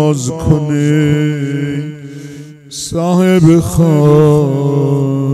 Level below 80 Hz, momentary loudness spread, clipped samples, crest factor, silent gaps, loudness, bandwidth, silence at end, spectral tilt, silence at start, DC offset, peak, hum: -36 dBFS; 18 LU; 0.3%; 12 dB; none; -12 LUFS; 13 kHz; 0 s; -7 dB/octave; 0 s; under 0.1%; 0 dBFS; none